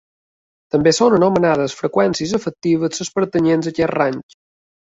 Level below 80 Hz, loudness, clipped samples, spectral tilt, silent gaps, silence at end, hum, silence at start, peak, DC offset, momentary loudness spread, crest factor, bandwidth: -54 dBFS; -17 LUFS; under 0.1%; -5.5 dB/octave; none; 0.75 s; none; 0.75 s; -2 dBFS; under 0.1%; 8 LU; 16 dB; 8.2 kHz